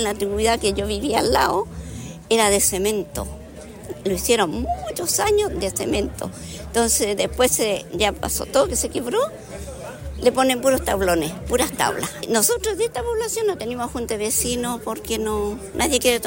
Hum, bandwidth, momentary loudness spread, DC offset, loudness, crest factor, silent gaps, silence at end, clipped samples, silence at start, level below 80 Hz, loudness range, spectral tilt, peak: none; 16.5 kHz; 14 LU; under 0.1%; -21 LUFS; 18 dB; none; 0 s; under 0.1%; 0 s; -38 dBFS; 2 LU; -3 dB/octave; -4 dBFS